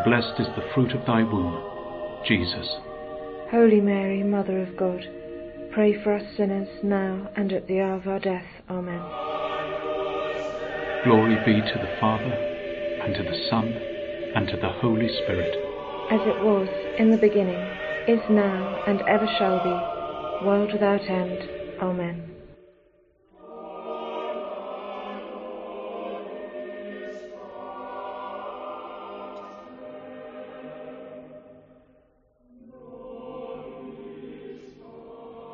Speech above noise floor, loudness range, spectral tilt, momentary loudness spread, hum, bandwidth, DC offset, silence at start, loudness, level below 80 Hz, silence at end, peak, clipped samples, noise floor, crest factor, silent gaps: 39 dB; 18 LU; -5 dB/octave; 19 LU; none; 6.6 kHz; under 0.1%; 0 s; -25 LUFS; -56 dBFS; 0 s; -4 dBFS; under 0.1%; -62 dBFS; 22 dB; none